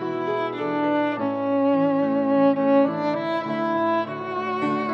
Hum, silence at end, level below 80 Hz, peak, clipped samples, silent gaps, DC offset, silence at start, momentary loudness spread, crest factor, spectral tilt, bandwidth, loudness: none; 0 s; -80 dBFS; -8 dBFS; under 0.1%; none; under 0.1%; 0 s; 6 LU; 14 dB; -8 dB/octave; 6 kHz; -23 LUFS